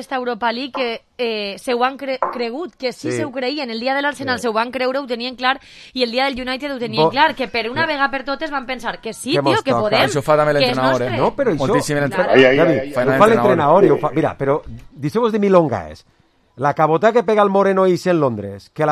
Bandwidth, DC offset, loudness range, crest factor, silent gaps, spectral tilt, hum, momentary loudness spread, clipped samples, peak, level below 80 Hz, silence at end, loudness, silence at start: 14 kHz; under 0.1%; 7 LU; 18 dB; none; -5.5 dB/octave; none; 11 LU; under 0.1%; 0 dBFS; -50 dBFS; 0 s; -17 LUFS; 0 s